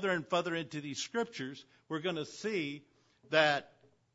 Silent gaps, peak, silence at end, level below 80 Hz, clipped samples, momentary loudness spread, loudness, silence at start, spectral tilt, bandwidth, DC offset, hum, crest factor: none; -12 dBFS; 0.5 s; -80 dBFS; under 0.1%; 14 LU; -35 LUFS; 0 s; -2.5 dB/octave; 7.6 kHz; under 0.1%; none; 24 dB